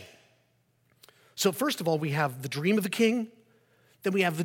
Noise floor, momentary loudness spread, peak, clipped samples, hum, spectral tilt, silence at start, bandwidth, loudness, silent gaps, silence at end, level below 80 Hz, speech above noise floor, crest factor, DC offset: -69 dBFS; 8 LU; -10 dBFS; under 0.1%; none; -5 dB/octave; 0 s; 17 kHz; -28 LUFS; none; 0 s; -78 dBFS; 42 dB; 20 dB; under 0.1%